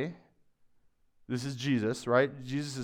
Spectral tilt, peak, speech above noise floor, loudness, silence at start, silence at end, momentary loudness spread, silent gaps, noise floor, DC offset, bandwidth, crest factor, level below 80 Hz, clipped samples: -6 dB/octave; -12 dBFS; 36 dB; -31 LUFS; 0 s; 0 s; 10 LU; none; -66 dBFS; under 0.1%; 15.5 kHz; 20 dB; -70 dBFS; under 0.1%